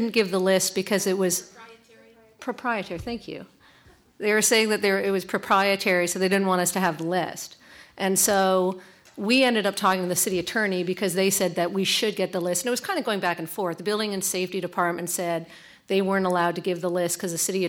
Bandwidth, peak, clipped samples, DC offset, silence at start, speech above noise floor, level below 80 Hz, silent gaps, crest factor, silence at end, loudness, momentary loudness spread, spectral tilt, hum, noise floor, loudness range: 18 kHz; -8 dBFS; under 0.1%; under 0.1%; 0 s; 31 dB; -62 dBFS; none; 18 dB; 0 s; -24 LUFS; 10 LU; -3 dB/octave; none; -56 dBFS; 4 LU